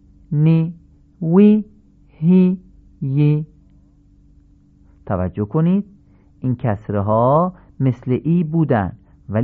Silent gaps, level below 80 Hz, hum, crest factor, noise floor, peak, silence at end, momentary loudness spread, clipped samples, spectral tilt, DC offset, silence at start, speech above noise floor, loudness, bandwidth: none; -44 dBFS; none; 16 dB; -50 dBFS; -2 dBFS; 0 s; 13 LU; under 0.1%; -12.5 dB/octave; under 0.1%; 0.3 s; 35 dB; -18 LUFS; 4.2 kHz